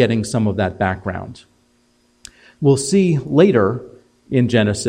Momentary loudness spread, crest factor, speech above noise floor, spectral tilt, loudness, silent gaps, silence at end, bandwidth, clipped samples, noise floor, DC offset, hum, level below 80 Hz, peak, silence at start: 13 LU; 16 dB; 43 dB; -6 dB/octave; -17 LUFS; none; 0 s; 15.5 kHz; under 0.1%; -59 dBFS; under 0.1%; none; -50 dBFS; 0 dBFS; 0 s